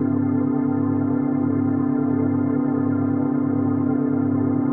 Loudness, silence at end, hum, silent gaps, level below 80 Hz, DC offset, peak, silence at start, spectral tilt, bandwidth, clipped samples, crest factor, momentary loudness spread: -21 LUFS; 0 s; none; none; -64 dBFS; under 0.1%; -10 dBFS; 0 s; -13.5 dB/octave; 2.3 kHz; under 0.1%; 10 dB; 1 LU